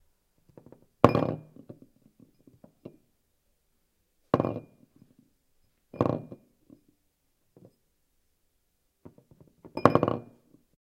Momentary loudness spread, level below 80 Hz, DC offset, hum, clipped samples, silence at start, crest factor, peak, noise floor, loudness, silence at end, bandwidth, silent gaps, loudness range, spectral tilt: 28 LU; -62 dBFS; under 0.1%; none; under 0.1%; 1.05 s; 34 dB; 0 dBFS; -74 dBFS; -28 LUFS; 0.8 s; 16 kHz; none; 7 LU; -8 dB/octave